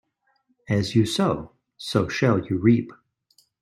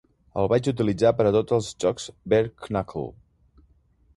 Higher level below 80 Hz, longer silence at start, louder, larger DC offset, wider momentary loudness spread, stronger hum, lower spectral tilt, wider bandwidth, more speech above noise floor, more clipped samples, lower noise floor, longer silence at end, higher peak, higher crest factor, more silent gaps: second, -56 dBFS vs -50 dBFS; first, 0.7 s vs 0.35 s; about the same, -23 LUFS vs -24 LUFS; neither; second, 10 LU vs 14 LU; neither; about the same, -6.5 dB/octave vs -6.5 dB/octave; first, 13 kHz vs 11.5 kHz; first, 47 dB vs 38 dB; neither; first, -69 dBFS vs -61 dBFS; second, 0.7 s vs 1.05 s; about the same, -6 dBFS vs -6 dBFS; about the same, 20 dB vs 18 dB; neither